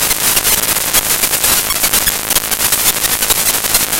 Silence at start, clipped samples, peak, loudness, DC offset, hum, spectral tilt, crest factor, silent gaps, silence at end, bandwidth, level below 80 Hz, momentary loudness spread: 0 s; under 0.1%; 0 dBFS; -11 LUFS; 0.5%; none; 0 dB/octave; 14 dB; none; 0 s; over 20 kHz; -34 dBFS; 2 LU